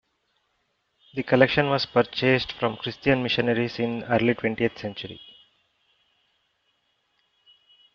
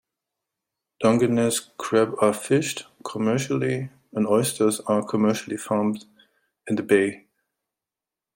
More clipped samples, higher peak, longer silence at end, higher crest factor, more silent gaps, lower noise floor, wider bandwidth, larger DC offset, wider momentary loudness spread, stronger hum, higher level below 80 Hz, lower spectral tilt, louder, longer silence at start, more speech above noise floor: neither; about the same, -2 dBFS vs -4 dBFS; first, 2.8 s vs 1.2 s; about the same, 24 dB vs 20 dB; neither; second, -73 dBFS vs -89 dBFS; second, 6.8 kHz vs 16.5 kHz; neither; first, 14 LU vs 9 LU; neither; first, -58 dBFS vs -66 dBFS; about the same, -4 dB/octave vs -5 dB/octave; about the same, -24 LUFS vs -23 LUFS; first, 1.15 s vs 1 s; second, 49 dB vs 67 dB